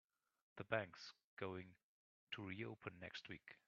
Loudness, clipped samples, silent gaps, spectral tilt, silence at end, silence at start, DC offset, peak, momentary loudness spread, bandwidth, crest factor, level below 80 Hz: -51 LUFS; under 0.1%; 1.24-1.37 s, 1.83-2.27 s; -3.5 dB/octave; 0.1 s; 0.55 s; under 0.1%; -24 dBFS; 13 LU; 7.2 kHz; 30 dB; -86 dBFS